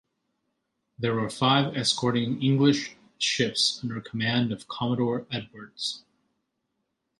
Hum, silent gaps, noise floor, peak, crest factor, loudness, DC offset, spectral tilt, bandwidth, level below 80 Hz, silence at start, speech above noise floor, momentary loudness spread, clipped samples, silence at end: none; none; -79 dBFS; -8 dBFS; 20 dB; -26 LUFS; under 0.1%; -4.5 dB/octave; 11.5 kHz; -66 dBFS; 1 s; 53 dB; 11 LU; under 0.1%; 1.2 s